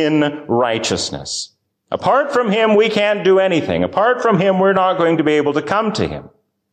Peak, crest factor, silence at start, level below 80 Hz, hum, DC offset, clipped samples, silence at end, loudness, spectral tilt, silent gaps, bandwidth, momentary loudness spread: -4 dBFS; 12 dB; 0 s; -48 dBFS; none; under 0.1%; under 0.1%; 0.45 s; -16 LUFS; -5 dB/octave; none; 9.6 kHz; 10 LU